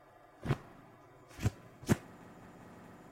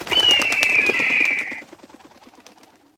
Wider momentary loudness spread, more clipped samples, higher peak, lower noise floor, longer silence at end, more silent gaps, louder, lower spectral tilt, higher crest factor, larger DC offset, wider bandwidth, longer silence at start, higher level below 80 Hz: first, 22 LU vs 13 LU; neither; second, -14 dBFS vs 0 dBFS; first, -58 dBFS vs -51 dBFS; second, 0.05 s vs 1.35 s; neither; second, -38 LUFS vs -16 LUFS; first, -6.5 dB/octave vs -0.5 dB/octave; first, 26 dB vs 20 dB; neither; second, 16.5 kHz vs 19.5 kHz; first, 0.4 s vs 0 s; about the same, -54 dBFS vs -58 dBFS